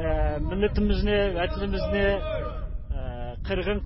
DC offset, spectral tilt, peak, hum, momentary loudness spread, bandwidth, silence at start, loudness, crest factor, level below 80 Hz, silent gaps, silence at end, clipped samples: under 0.1%; -11 dB/octave; -12 dBFS; none; 11 LU; 5.8 kHz; 0 s; -27 LUFS; 14 dB; -30 dBFS; none; 0 s; under 0.1%